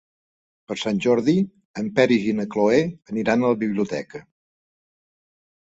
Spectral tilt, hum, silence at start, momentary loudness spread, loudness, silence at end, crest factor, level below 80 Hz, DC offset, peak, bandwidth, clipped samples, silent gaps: -6.5 dB/octave; none; 0.7 s; 12 LU; -22 LUFS; 1.45 s; 20 dB; -62 dBFS; under 0.1%; -4 dBFS; 8 kHz; under 0.1%; 1.65-1.74 s